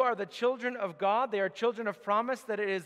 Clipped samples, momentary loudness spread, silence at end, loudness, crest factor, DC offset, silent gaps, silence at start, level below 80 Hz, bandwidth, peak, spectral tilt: under 0.1%; 5 LU; 0 s; -31 LUFS; 16 dB; under 0.1%; none; 0 s; -88 dBFS; 14 kHz; -14 dBFS; -5 dB/octave